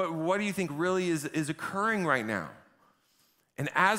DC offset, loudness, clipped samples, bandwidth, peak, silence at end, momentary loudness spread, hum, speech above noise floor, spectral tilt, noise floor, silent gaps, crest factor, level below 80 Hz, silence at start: under 0.1%; -30 LUFS; under 0.1%; 16 kHz; -8 dBFS; 0 s; 9 LU; none; 40 dB; -5 dB/octave; -69 dBFS; none; 22 dB; -72 dBFS; 0 s